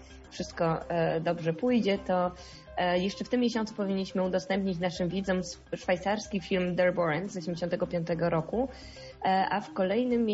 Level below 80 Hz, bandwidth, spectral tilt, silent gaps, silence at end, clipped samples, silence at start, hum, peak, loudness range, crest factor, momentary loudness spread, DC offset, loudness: -54 dBFS; 8 kHz; -5 dB/octave; none; 0 s; under 0.1%; 0 s; none; -14 dBFS; 1 LU; 14 dB; 8 LU; under 0.1%; -30 LUFS